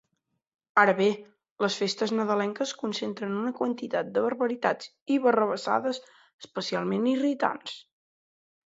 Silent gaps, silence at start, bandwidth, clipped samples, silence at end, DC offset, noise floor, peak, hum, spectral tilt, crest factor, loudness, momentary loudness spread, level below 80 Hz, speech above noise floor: 1.51-1.56 s, 5.02-5.06 s, 6.33-6.39 s; 0.75 s; 8 kHz; under 0.1%; 0.85 s; under 0.1%; -80 dBFS; -6 dBFS; none; -4.5 dB/octave; 22 dB; -27 LUFS; 12 LU; -78 dBFS; 53 dB